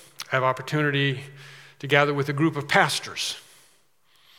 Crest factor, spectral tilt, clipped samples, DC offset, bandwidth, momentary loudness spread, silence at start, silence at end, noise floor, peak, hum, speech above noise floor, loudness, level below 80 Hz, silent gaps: 24 dB; -4.5 dB/octave; under 0.1%; under 0.1%; 16.5 kHz; 17 LU; 0.2 s; 1 s; -63 dBFS; -2 dBFS; none; 39 dB; -23 LUFS; -74 dBFS; none